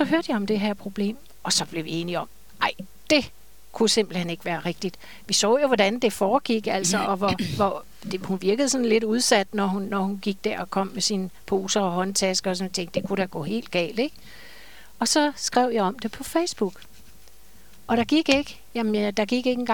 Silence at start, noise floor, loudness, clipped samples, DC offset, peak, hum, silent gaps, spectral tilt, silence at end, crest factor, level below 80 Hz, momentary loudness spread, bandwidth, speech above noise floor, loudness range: 0 s; -53 dBFS; -24 LUFS; under 0.1%; 0.7%; -4 dBFS; none; none; -3.5 dB/octave; 0 s; 20 dB; -56 dBFS; 9 LU; 19 kHz; 29 dB; 3 LU